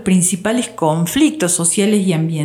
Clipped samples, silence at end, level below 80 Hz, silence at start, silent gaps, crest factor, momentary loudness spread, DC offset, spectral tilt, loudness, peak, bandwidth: under 0.1%; 0 s; -52 dBFS; 0 s; none; 12 dB; 4 LU; under 0.1%; -4.5 dB/octave; -15 LUFS; -2 dBFS; 18 kHz